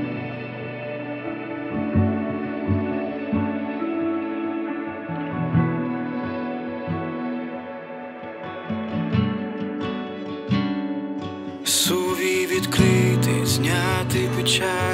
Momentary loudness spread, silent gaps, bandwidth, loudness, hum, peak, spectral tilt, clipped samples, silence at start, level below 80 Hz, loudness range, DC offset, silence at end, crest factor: 12 LU; none; 16 kHz; -24 LUFS; none; -4 dBFS; -5 dB/octave; under 0.1%; 0 s; -50 dBFS; 8 LU; under 0.1%; 0 s; 20 dB